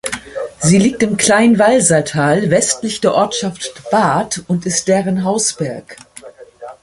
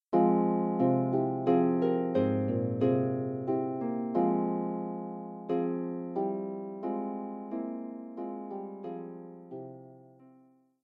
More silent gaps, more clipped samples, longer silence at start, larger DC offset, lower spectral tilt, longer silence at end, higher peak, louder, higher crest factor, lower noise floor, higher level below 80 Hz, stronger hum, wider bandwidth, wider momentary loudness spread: neither; neither; about the same, 0.05 s vs 0.1 s; neither; second, -4 dB/octave vs -11.5 dB/octave; second, 0.1 s vs 0.55 s; first, 0 dBFS vs -14 dBFS; first, -14 LUFS vs -31 LUFS; about the same, 14 dB vs 18 dB; second, -37 dBFS vs -62 dBFS; first, -50 dBFS vs -78 dBFS; neither; first, 11.5 kHz vs 4.2 kHz; about the same, 13 LU vs 15 LU